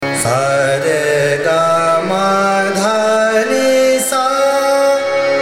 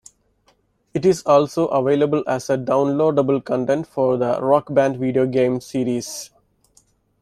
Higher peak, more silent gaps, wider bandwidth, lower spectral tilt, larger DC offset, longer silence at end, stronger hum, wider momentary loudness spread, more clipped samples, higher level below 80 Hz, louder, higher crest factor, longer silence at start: about the same, -2 dBFS vs -2 dBFS; neither; first, 16.5 kHz vs 14 kHz; second, -3.5 dB/octave vs -6.5 dB/octave; neither; second, 0 s vs 0.95 s; neither; second, 2 LU vs 7 LU; neither; about the same, -56 dBFS vs -58 dBFS; first, -13 LUFS vs -19 LUFS; second, 12 dB vs 18 dB; second, 0 s vs 0.95 s